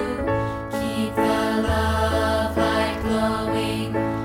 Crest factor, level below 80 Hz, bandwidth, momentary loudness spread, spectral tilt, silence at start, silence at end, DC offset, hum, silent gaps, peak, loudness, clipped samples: 14 dB; -36 dBFS; 16.5 kHz; 4 LU; -6 dB/octave; 0 s; 0 s; under 0.1%; none; none; -10 dBFS; -23 LUFS; under 0.1%